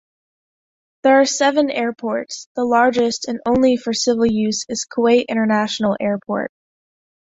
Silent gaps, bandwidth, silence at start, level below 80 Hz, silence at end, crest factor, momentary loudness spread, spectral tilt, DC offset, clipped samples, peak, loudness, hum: 2.46-2.55 s; 8 kHz; 1.05 s; -54 dBFS; 0.9 s; 16 dB; 9 LU; -4 dB/octave; under 0.1%; under 0.1%; -2 dBFS; -18 LUFS; none